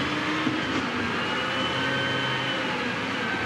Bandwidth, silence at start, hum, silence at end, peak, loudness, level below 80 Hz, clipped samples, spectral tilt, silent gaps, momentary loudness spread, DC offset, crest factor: 14.5 kHz; 0 s; none; 0 s; -14 dBFS; -26 LUFS; -58 dBFS; under 0.1%; -4.5 dB/octave; none; 2 LU; under 0.1%; 12 dB